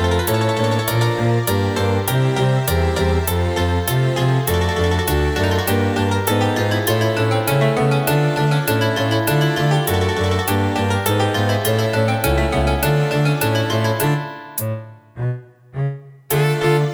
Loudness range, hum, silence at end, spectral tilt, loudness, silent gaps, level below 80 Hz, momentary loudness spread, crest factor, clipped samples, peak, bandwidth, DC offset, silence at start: 3 LU; none; 0 s; -5.5 dB/octave; -18 LUFS; none; -32 dBFS; 8 LU; 14 dB; under 0.1%; -4 dBFS; over 20 kHz; under 0.1%; 0 s